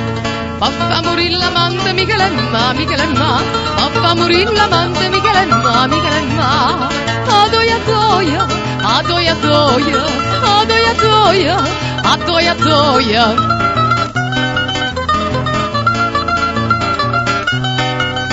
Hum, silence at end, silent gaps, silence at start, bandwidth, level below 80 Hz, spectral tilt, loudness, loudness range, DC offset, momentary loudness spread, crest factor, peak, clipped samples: none; 0 s; none; 0 s; 8 kHz; -34 dBFS; -4.5 dB/octave; -12 LUFS; 3 LU; 0.3%; 5 LU; 14 dB; 0 dBFS; under 0.1%